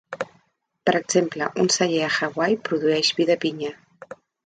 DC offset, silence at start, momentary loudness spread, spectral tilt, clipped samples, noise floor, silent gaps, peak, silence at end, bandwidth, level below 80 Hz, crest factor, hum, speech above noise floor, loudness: under 0.1%; 0.1 s; 14 LU; -3.5 dB/octave; under 0.1%; -66 dBFS; none; -4 dBFS; 0.3 s; 9.4 kHz; -68 dBFS; 18 dB; none; 45 dB; -22 LUFS